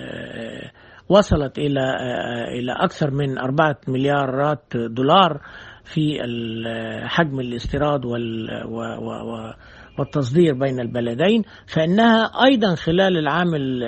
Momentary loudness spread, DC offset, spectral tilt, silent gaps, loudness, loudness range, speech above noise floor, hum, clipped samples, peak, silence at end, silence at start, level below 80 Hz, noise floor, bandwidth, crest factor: 15 LU; under 0.1%; -6.5 dB/octave; none; -20 LUFS; 6 LU; 20 dB; none; under 0.1%; 0 dBFS; 0 s; 0 s; -42 dBFS; -40 dBFS; 8.4 kHz; 20 dB